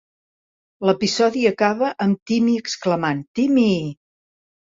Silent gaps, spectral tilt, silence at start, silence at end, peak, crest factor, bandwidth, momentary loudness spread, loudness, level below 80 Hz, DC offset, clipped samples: 2.22-2.26 s, 3.28-3.34 s; -5.5 dB/octave; 0.8 s; 0.75 s; -4 dBFS; 18 dB; 7.8 kHz; 6 LU; -20 LUFS; -60 dBFS; under 0.1%; under 0.1%